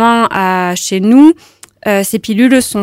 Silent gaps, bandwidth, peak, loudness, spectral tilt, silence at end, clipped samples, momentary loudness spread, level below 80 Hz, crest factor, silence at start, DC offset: none; 16.5 kHz; 0 dBFS; -10 LUFS; -4.5 dB/octave; 0 s; 0.5%; 9 LU; -50 dBFS; 10 dB; 0 s; under 0.1%